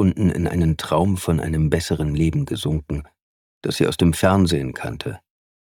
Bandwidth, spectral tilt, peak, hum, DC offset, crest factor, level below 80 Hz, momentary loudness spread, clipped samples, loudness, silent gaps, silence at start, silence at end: 17.5 kHz; -6.5 dB/octave; -2 dBFS; none; under 0.1%; 18 dB; -36 dBFS; 13 LU; under 0.1%; -21 LUFS; 3.22-3.61 s; 0 s; 0.45 s